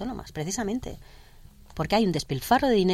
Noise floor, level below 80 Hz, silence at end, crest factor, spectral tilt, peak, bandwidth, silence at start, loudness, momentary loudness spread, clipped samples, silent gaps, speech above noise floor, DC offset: -49 dBFS; -46 dBFS; 0 s; 18 dB; -5 dB/octave; -10 dBFS; 16 kHz; 0 s; -26 LUFS; 19 LU; under 0.1%; none; 24 dB; under 0.1%